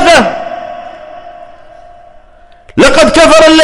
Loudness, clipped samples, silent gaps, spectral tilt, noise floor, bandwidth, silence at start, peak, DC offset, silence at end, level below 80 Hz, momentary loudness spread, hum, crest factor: -6 LUFS; 1%; none; -3 dB/octave; -38 dBFS; 13.5 kHz; 0 s; 0 dBFS; under 0.1%; 0 s; -30 dBFS; 25 LU; none; 8 dB